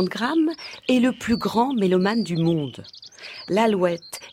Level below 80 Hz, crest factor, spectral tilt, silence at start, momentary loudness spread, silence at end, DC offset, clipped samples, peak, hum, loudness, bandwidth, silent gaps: -58 dBFS; 16 dB; -6 dB/octave; 0 s; 16 LU; 0 s; under 0.1%; under 0.1%; -6 dBFS; none; -22 LUFS; 16 kHz; none